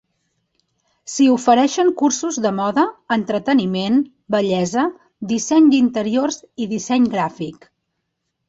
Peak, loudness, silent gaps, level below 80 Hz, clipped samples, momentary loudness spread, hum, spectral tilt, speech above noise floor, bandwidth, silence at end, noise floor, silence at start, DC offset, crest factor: -2 dBFS; -18 LUFS; none; -62 dBFS; under 0.1%; 11 LU; none; -4.5 dB/octave; 57 dB; 8 kHz; 0.95 s; -75 dBFS; 1.05 s; under 0.1%; 16 dB